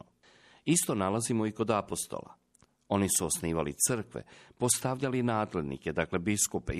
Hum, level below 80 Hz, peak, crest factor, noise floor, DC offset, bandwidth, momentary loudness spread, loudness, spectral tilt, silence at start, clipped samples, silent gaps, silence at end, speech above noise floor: none; -54 dBFS; -12 dBFS; 20 dB; -67 dBFS; under 0.1%; 14.5 kHz; 8 LU; -30 LUFS; -4 dB/octave; 0.65 s; under 0.1%; none; 0 s; 36 dB